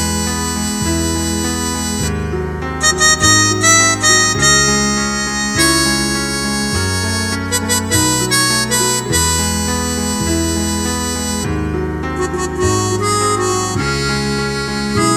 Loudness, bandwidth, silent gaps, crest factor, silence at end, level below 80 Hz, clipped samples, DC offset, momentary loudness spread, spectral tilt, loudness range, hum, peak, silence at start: -14 LUFS; 19 kHz; none; 16 dB; 0 s; -30 dBFS; under 0.1%; under 0.1%; 9 LU; -3 dB/octave; 6 LU; none; 0 dBFS; 0 s